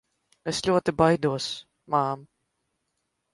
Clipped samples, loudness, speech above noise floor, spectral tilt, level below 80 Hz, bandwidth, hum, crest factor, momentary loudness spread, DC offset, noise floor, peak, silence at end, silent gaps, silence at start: under 0.1%; -25 LUFS; 54 dB; -5 dB/octave; -56 dBFS; 11.5 kHz; none; 22 dB; 15 LU; under 0.1%; -78 dBFS; -6 dBFS; 1.1 s; none; 0.45 s